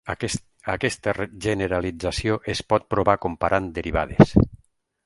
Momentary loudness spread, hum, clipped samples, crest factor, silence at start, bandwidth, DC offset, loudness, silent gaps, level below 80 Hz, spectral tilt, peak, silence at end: 10 LU; none; under 0.1%; 22 dB; 0.05 s; 11.5 kHz; under 0.1%; -23 LUFS; none; -38 dBFS; -6 dB/octave; 0 dBFS; 0.5 s